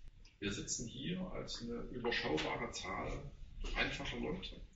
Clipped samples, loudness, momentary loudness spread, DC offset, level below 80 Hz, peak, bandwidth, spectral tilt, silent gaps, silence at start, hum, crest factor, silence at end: under 0.1%; -41 LUFS; 8 LU; under 0.1%; -50 dBFS; -20 dBFS; 8 kHz; -3 dB/octave; none; 0 s; none; 22 dB; 0 s